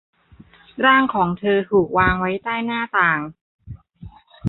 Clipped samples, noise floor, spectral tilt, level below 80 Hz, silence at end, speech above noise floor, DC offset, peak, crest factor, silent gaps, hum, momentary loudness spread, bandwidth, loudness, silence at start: under 0.1%; -49 dBFS; -9.5 dB/octave; -42 dBFS; 0 s; 30 dB; under 0.1%; -2 dBFS; 18 dB; 3.41-3.59 s; none; 10 LU; 4.2 kHz; -18 LUFS; 0.75 s